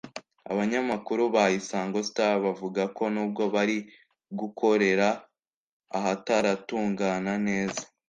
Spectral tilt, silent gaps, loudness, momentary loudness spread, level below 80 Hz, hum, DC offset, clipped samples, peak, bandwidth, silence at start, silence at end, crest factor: -5 dB/octave; 5.56-5.80 s; -27 LUFS; 12 LU; -68 dBFS; none; under 0.1%; under 0.1%; -10 dBFS; 9.6 kHz; 0.05 s; 0.25 s; 18 dB